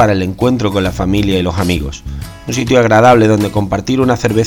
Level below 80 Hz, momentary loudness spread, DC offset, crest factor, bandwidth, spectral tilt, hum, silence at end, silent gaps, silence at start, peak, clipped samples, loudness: -30 dBFS; 13 LU; under 0.1%; 12 dB; 19 kHz; -6 dB/octave; none; 0 s; none; 0 s; 0 dBFS; 0.2%; -12 LUFS